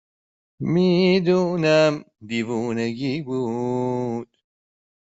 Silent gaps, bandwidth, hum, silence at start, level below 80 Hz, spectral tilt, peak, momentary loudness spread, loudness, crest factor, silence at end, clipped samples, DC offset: none; 8 kHz; none; 0.6 s; -62 dBFS; -6.5 dB/octave; -6 dBFS; 12 LU; -22 LUFS; 18 dB; 0.95 s; under 0.1%; under 0.1%